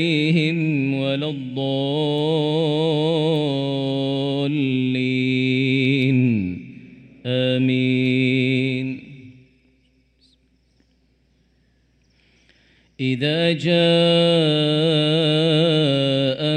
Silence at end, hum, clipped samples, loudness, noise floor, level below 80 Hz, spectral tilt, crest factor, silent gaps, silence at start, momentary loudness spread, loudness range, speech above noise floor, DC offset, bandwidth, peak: 0 s; none; under 0.1%; -19 LUFS; -62 dBFS; -62 dBFS; -7 dB/octave; 14 dB; none; 0 s; 8 LU; 9 LU; 43 dB; under 0.1%; 9.4 kHz; -6 dBFS